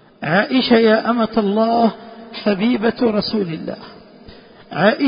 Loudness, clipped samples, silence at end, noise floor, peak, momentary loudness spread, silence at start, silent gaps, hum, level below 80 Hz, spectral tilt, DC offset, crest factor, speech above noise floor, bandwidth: -17 LUFS; under 0.1%; 0 s; -42 dBFS; 0 dBFS; 16 LU; 0.2 s; none; none; -54 dBFS; -10.5 dB/octave; under 0.1%; 18 dB; 26 dB; 5.4 kHz